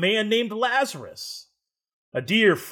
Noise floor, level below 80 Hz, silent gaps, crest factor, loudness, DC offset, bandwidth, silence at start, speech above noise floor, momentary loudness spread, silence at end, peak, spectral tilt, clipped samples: -72 dBFS; -76 dBFS; 1.93-2.12 s; 18 dB; -22 LUFS; under 0.1%; 19 kHz; 0 s; 49 dB; 16 LU; 0 s; -6 dBFS; -4 dB/octave; under 0.1%